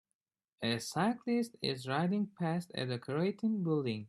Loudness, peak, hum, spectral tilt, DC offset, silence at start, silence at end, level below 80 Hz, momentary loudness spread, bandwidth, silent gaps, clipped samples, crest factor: -35 LUFS; -18 dBFS; none; -6 dB/octave; under 0.1%; 0.6 s; 0 s; -74 dBFS; 4 LU; 14 kHz; none; under 0.1%; 18 dB